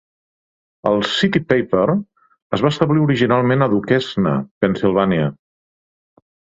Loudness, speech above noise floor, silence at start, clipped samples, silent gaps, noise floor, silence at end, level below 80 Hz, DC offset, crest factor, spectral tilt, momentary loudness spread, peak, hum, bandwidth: -17 LUFS; over 74 dB; 0.85 s; under 0.1%; 2.42-2.50 s, 4.51-4.61 s; under -90 dBFS; 1.25 s; -52 dBFS; under 0.1%; 16 dB; -7 dB/octave; 5 LU; -2 dBFS; none; 7.8 kHz